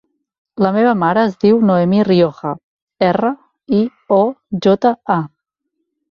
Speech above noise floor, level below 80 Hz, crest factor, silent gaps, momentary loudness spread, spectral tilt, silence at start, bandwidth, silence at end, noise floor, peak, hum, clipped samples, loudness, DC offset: 60 dB; -56 dBFS; 14 dB; 2.64-2.87 s; 13 LU; -8.5 dB/octave; 0.55 s; 6.8 kHz; 0.85 s; -73 dBFS; -2 dBFS; none; under 0.1%; -15 LUFS; under 0.1%